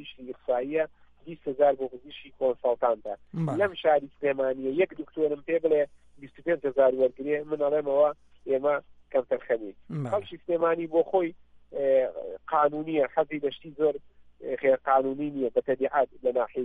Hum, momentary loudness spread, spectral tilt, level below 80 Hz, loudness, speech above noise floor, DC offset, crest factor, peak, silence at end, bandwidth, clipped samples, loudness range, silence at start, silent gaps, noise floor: none; 12 LU; -8 dB/octave; -66 dBFS; -27 LUFS; 23 dB; under 0.1%; 16 dB; -10 dBFS; 0 s; 3.9 kHz; under 0.1%; 2 LU; 0 s; none; -49 dBFS